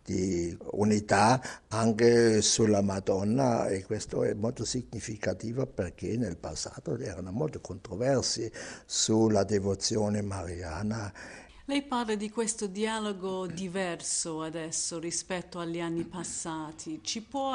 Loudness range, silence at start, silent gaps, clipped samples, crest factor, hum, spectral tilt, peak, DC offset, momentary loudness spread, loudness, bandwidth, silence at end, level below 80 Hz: 8 LU; 0.05 s; none; under 0.1%; 22 dB; none; -4.5 dB/octave; -8 dBFS; under 0.1%; 13 LU; -30 LUFS; 10.5 kHz; 0 s; -56 dBFS